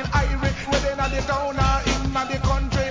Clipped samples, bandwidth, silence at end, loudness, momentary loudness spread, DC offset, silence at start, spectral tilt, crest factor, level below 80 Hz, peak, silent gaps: under 0.1%; 7.6 kHz; 0 s; -23 LUFS; 3 LU; under 0.1%; 0 s; -5 dB/octave; 16 dB; -26 dBFS; -6 dBFS; none